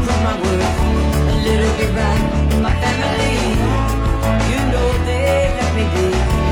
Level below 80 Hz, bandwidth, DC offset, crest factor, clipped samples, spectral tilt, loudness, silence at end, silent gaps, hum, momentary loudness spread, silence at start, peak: -20 dBFS; 16.5 kHz; under 0.1%; 12 dB; under 0.1%; -6 dB/octave; -17 LUFS; 0 s; none; none; 1 LU; 0 s; -4 dBFS